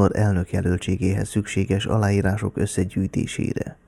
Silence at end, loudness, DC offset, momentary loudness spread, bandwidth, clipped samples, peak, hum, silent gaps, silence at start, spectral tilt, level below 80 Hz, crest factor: 0.15 s; -23 LUFS; under 0.1%; 5 LU; 12.5 kHz; under 0.1%; -6 dBFS; none; none; 0 s; -6.5 dB/octave; -42 dBFS; 16 dB